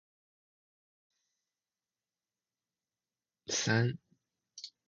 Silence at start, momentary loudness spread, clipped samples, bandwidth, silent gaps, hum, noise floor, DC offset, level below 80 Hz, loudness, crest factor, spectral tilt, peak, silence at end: 3.5 s; 19 LU; under 0.1%; 7.8 kHz; none; none; under -90 dBFS; under 0.1%; -74 dBFS; -32 LUFS; 26 dB; -4 dB/octave; -16 dBFS; 0.2 s